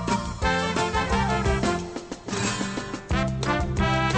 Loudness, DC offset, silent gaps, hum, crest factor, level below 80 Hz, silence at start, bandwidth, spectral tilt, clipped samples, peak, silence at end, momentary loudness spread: -26 LUFS; under 0.1%; none; none; 18 dB; -34 dBFS; 0 s; 9.8 kHz; -5 dB/octave; under 0.1%; -8 dBFS; 0 s; 7 LU